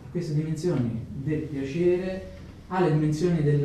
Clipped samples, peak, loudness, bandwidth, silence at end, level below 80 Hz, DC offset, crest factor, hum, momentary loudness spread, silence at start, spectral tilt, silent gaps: under 0.1%; -12 dBFS; -27 LUFS; 10 kHz; 0 s; -50 dBFS; under 0.1%; 14 dB; none; 10 LU; 0 s; -8 dB/octave; none